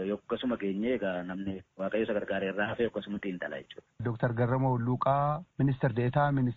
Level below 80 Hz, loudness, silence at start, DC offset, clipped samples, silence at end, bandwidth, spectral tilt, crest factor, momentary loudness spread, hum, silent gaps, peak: -58 dBFS; -31 LUFS; 0 s; under 0.1%; under 0.1%; 0 s; 4.3 kHz; -6.5 dB/octave; 16 dB; 10 LU; none; none; -14 dBFS